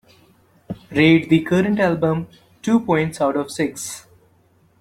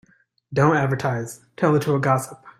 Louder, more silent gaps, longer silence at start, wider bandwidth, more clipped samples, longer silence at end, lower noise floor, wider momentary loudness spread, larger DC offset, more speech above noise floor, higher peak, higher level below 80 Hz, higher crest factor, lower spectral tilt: about the same, -19 LUFS vs -21 LUFS; neither; first, 0.7 s vs 0.5 s; about the same, 14.5 kHz vs 15.5 kHz; neither; first, 0.8 s vs 0.1 s; first, -57 dBFS vs -52 dBFS; first, 18 LU vs 10 LU; neither; first, 39 dB vs 31 dB; about the same, -2 dBFS vs -4 dBFS; about the same, -54 dBFS vs -56 dBFS; about the same, 18 dB vs 18 dB; about the same, -6 dB/octave vs -7 dB/octave